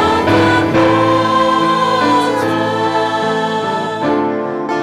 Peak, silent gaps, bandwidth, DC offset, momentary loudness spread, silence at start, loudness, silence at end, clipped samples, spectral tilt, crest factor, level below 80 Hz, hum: -4 dBFS; none; 14 kHz; under 0.1%; 6 LU; 0 s; -14 LUFS; 0 s; under 0.1%; -5.5 dB/octave; 10 dB; -44 dBFS; none